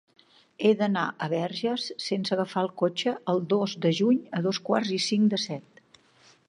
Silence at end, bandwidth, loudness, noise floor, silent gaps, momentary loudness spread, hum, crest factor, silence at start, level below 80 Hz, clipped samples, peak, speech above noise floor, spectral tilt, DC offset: 0.9 s; 10.5 kHz; -27 LUFS; -59 dBFS; none; 6 LU; none; 18 dB; 0.6 s; -76 dBFS; under 0.1%; -10 dBFS; 33 dB; -5.5 dB/octave; under 0.1%